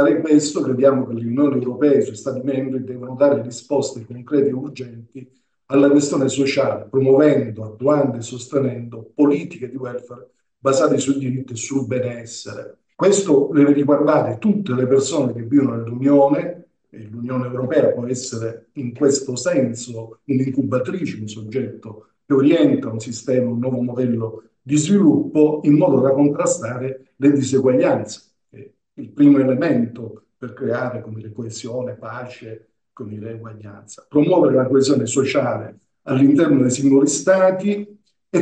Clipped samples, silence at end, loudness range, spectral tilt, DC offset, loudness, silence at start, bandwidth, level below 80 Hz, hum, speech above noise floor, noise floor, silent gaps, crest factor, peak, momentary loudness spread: under 0.1%; 0 s; 6 LU; -6 dB/octave; under 0.1%; -18 LUFS; 0 s; 9.2 kHz; -66 dBFS; none; 26 dB; -44 dBFS; none; 16 dB; -2 dBFS; 17 LU